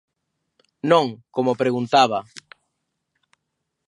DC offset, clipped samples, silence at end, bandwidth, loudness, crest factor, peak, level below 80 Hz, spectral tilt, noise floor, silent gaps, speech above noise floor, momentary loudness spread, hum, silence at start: under 0.1%; under 0.1%; 1.65 s; 11 kHz; -20 LUFS; 22 dB; -2 dBFS; -72 dBFS; -5 dB/octave; -78 dBFS; none; 59 dB; 12 LU; none; 0.85 s